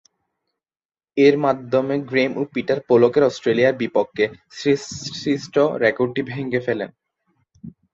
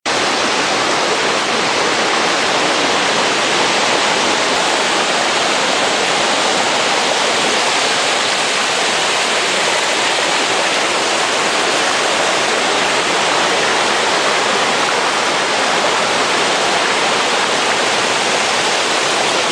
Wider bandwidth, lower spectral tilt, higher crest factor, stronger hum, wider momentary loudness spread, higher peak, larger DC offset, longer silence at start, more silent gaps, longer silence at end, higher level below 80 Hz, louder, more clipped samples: second, 7.8 kHz vs 14 kHz; first, -5.5 dB/octave vs -1 dB/octave; about the same, 18 dB vs 14 dB; neither; first, 10 LU vs 1 LU; about the same, -2 dBFS vs 0 dBFS; neither; first, 1.15 s vs 0.05 s; neither; first, 0.25 s vs 0 s; about the same, -60 dBFS vs -56 dBFS; second, -20 LUFS vs -13 LUFS; neither